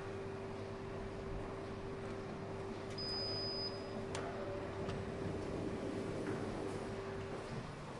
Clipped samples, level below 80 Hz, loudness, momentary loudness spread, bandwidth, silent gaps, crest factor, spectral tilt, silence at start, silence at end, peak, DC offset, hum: under 0.1%; -58 dBFS; -43 LUFS; 6 LU; 11.5 kHz; none; 16 dB; -5.5 dB/octave; 0 s; 0 s; -26 dBFS; under 0.1%; none